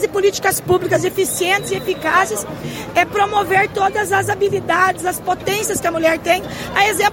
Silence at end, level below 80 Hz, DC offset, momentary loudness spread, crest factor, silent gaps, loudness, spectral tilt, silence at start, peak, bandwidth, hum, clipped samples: 0 s; -46 dBFS; under 0.1%; 5 LU; 16 dB; none; -17 LUFS; -3.5 dB/octave; 0 s; 0 dBFS; 17 kHz; none; under 0.1%